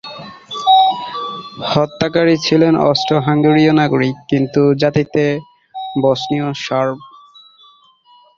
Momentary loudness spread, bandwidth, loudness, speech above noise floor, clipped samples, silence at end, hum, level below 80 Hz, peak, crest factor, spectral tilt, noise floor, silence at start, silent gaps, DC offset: 14 LU; 7.4 kHz; -15 LUFS; 35 dB; under 0.1%; 1.3 s; none; -52 dBFS; 0 dBFS; 16 dB; -6.5 dB/octave; -49 dBFS; 0.05 s; none; under 0.1%